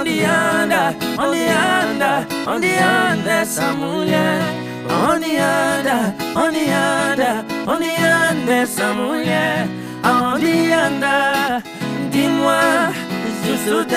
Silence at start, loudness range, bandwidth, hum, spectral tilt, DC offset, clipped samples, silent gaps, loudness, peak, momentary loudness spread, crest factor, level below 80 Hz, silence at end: 0 s; 1 LU; 16 kHz; none; -4 dB/octave; under 0.1%; under 0.1%; none; -17 LUFS; -2 dBFS; 6 LU; 16 dB; -54 dBFS; 0 s